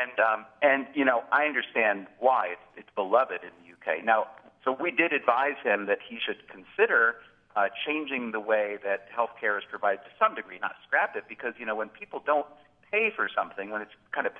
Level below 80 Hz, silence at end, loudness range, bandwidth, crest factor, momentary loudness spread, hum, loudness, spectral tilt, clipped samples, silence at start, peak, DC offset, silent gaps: -76 dBFS; 0 s; 4 LU; 4.7 kHz; 22 dB; 12 LU; none; -28 LUFS; -6.5 dB/octave; under 0.1%; 0 s; -6 dBFS; under 0.1%; none